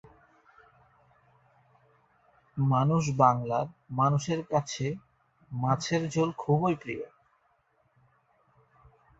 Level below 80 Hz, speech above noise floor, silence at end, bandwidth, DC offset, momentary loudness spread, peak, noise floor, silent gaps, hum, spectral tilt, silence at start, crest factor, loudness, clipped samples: -64 dBFS; 43 dB; 2.15 s; 8 kHz; under 0.1%; 15 LU; -8 dBFS; -70 dBFS; none; none; -6.5 dB/octave; 2.55 s; 24 dB; -28 LUFS; under 0.1%